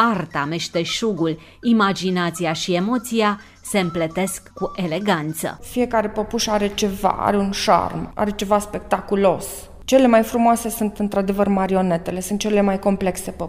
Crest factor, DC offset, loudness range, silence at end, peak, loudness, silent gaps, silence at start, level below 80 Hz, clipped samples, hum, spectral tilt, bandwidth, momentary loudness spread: 18 dB; under 0.1%; 4 LU; 0 s; -2 dBFS; -20 LUFS; none; 0 s; -44 dBFS; under 0.1%; none; -5 dB/octave; 16 kHz; 8 LU